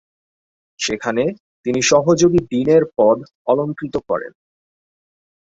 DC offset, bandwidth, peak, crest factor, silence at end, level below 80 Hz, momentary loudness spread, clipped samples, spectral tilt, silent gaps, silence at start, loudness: under 0.1%; 8 kHz; 0 dBFS; 18 dB; 1.3 s; -52 dBFS; 11 LU; under 0.1%; -4.5 dB/octave; 1.40-1.63 s, 3.35-3.45 s; 0.8 s; -17 LUFS